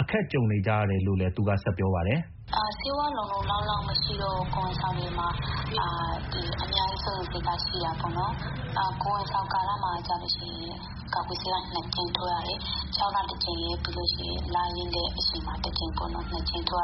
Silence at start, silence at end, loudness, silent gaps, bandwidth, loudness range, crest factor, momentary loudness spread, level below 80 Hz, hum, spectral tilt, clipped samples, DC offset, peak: 0 s; 0 s; -29 LUFS; none; 6 kHz; 2 LU; 22 dB; 5 LU; -40 dBFS; none; -3.5 dB/octave; under 0.1%; under 0.1%; -8 dBFS